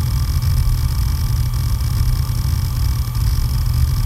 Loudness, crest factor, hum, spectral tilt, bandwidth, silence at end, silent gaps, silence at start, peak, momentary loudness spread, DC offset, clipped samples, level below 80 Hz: -19 LUFS; 12 dB; none; -5.5 dB/octave; 16.5 kHz; 0 s; none; 0 s; -4 dBFS; 2 LU; under 0.1%; under 0.1%; -20 dBFS